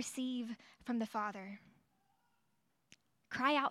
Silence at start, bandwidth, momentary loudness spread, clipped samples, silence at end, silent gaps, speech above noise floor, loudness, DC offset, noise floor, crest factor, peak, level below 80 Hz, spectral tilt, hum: 0 s; 14 kHz; 16 LU; under 0.1%; 0 s; none; 43 dB; -40 LUFS; under 0.1%; -81 dBFS; 22 dB; -20 dBFS; -82 dBFS; -3.5 dB/octave; none